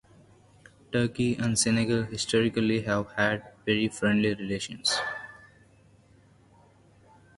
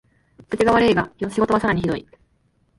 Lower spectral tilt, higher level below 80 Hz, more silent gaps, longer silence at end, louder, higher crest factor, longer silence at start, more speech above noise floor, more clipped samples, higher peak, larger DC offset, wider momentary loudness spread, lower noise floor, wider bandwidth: second, -4 dB/octave vs -6.5 dB/octave; second, -58 dBFS vs -46 dBFS; neither; first, 2 s vs 0.8 s; second, -27 LUFS vs -20 LUFS; about the same, 18 dB vs 16 dB; first, 0.9 s vs 0.5 s; second, 32 dB vs 44 dB; neither; second, -10 dBFS vs -4 dBFS; neither; second, 8 LU vs 11 LU; second, -58 dBFS vs -63 dBFS; about the same, 11.5 kHz vs 11.5 kHz